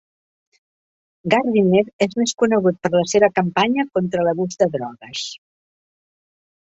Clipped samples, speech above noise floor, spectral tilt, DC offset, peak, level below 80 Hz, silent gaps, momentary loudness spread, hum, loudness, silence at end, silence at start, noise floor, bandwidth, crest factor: under 0.1%; over 72 dB; -5 dB/octave; under 0.1%; -2 dBFS; -60 dBFS; 1.93-1.99 s; 12 LU; none; -19 LUFS; 1.3 s; 1.25 s; under -90 dBFS; 8.2 kHz; 18 dB